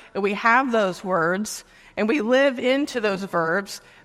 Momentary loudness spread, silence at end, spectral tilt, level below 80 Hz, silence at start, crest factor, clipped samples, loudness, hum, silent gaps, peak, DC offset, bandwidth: 10 LU; 0.25 s; -4.5 dB/octave; -62 dBFS; 0.15 s; 18 dB; under 0.1%; -22 LUFS; none; none; -4 dBFS; under 0.1%; 15.5 kHz